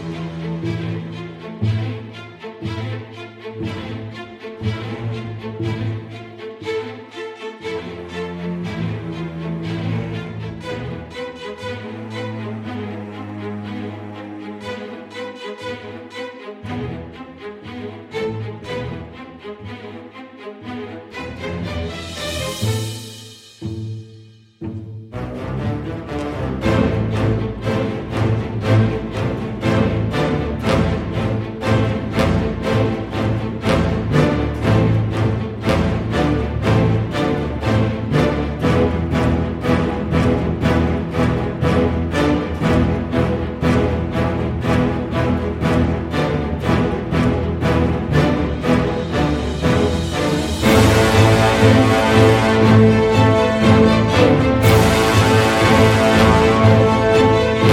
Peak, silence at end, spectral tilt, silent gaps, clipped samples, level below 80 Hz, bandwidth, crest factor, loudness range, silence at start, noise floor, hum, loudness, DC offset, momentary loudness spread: 0 dBFS; 0 s; -6.5 dB/octave; none; under 0.1%; -32 dBFS; 16 kHz; 18 dB; 16 LU; 0 s; -43 dBFS; none; -18 LUFS; under 0.1%; 19 LU